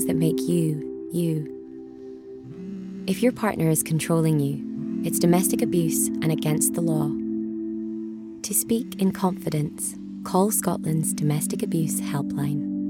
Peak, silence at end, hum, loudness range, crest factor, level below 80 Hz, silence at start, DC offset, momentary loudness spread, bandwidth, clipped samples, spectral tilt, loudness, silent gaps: -8 dBFS; 0 s; none; 4 LU; 18 dB; -60 dBFS; 0 s; under 0.1%; 14 LU; 17.5 kHz; under 0.1%; -5.5 dB/octave; -24 LUFS; none